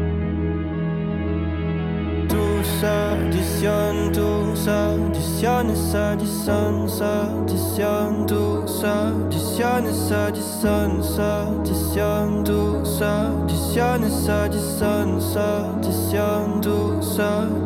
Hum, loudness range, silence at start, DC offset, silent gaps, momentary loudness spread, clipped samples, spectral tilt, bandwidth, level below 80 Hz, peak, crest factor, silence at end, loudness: none; 1 LU; 0 s; under 0.1%; none; 4 LU; under 0.1%; -6 dB/octave; 17 kHz; -34 dBFS; -8 dBFS; 12 dB; 0 s; -22 LUFS